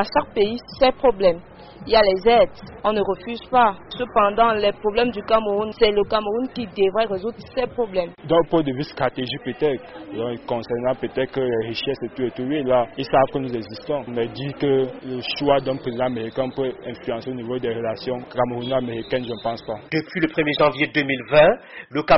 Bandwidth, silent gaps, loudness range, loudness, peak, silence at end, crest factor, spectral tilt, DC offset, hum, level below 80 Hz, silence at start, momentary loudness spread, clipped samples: 6 kHz; none; 6 LU; -22 LUFS; -4 dBFS; 0 s; 18 dB; -3.5 dB/octave; under 0.1%; none; -46 dBFS; 0 s; 11 LU; under 0.1%